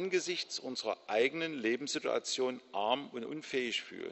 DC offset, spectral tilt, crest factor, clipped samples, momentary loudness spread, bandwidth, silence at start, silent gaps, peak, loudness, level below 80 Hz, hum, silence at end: under 0.1%; -2.5 dB/octave; 20 dB; under 0.1%; 6 LU; 8.2 kHz; 0 s; none; -16 dBFS; -35 LUFS; -82 dBFS; none; 0 s